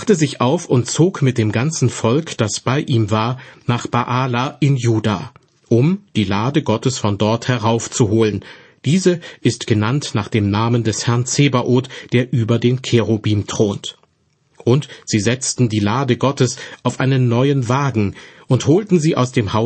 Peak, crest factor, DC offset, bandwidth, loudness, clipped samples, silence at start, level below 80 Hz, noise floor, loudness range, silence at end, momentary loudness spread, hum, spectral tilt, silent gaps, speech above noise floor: -2 dBFS; 14 dB; under 0.1%; 8.8 kHz; -17 LUFS; under 0.1%; 0 s; -52 dBFS; -61 dBFS; 2 LU; 0 s; 5 LU; none; -5.5 dB/octave; none; 45 dB